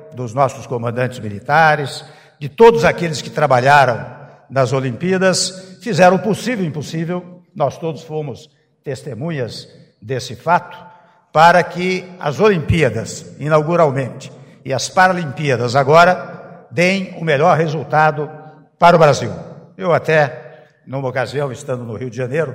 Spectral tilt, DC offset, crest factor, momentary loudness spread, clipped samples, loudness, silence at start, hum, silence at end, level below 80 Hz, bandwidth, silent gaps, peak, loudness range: -5.5 dB/octave; under 0.1%; 16 dB; 18 LU; under 0.1%; -16 LUFS; 0 s; none; 0 s; -48 dBFS; 16 kHz; none; 0 dBFS; 9 LU